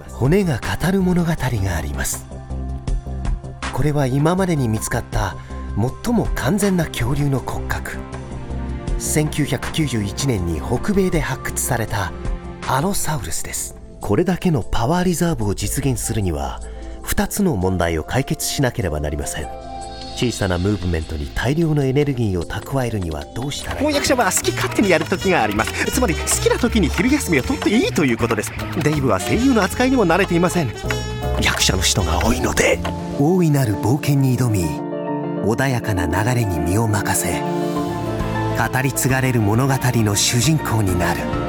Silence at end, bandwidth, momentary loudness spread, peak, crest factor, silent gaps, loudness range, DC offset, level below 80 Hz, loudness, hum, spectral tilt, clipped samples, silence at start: 0 s; 19.5 kHz; 10 LU; -2 dBFS; 16 dB; none; 5 LU; under 0.1%; -30 dBFS; -19 LUFS; none; -5 dB/octave; under 0.1%; 0 s